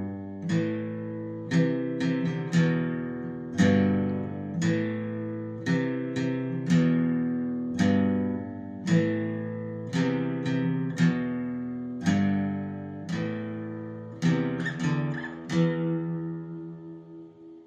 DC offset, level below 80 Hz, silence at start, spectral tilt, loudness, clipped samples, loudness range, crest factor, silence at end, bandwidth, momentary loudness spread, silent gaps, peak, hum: under 0.1%; -68 dBFS; 0 s; -7.5 dB/octave; -28 LUFS; under 0.1%; 3 LU; 18 dB; 0 s; 8.6 kHz; 12 LU; none; -10 dBFS; none